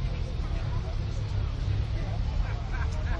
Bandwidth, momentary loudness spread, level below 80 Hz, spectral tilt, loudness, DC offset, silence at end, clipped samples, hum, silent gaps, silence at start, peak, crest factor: 7.8 kHz; 2 LU; -32 dBFS; -7 dB/octave; -32 LUFS; under 0.1%; 0 s; under 0.1%; none; none; 0 s; -16 dBFS; 12 dB